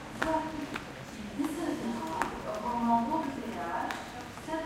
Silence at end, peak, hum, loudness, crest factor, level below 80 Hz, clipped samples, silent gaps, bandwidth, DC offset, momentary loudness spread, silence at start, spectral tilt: 0 s; -8 dBFS; none; -34 LUFS; 24 dB; -56 dBFS; under 0.1%; none; 16.5 kHz; under 0.1%; 12 LU; 0 s; -5 dB/octave